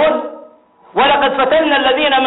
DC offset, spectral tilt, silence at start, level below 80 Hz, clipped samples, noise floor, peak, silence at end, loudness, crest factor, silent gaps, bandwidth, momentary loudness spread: under 0.1%; 0.5 dB/octave; 0 s; -48 dBFS; under 0.1%; -44 dBFS; -2 dBFS; 0 s; -13 LUFS; 12 dB; none; 4.1 kHz; 10 LU